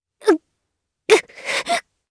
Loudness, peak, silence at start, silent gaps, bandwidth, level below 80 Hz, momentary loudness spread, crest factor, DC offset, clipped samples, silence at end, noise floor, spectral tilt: -20 LUFS; 0 dBFS; 0.25 s; none; 11 kHz; -66 dBFS; 7 LU; 20 dB; under 0.1%; under 0.1%; 0.3 s; -77 dBFS; -1.5 dB/octave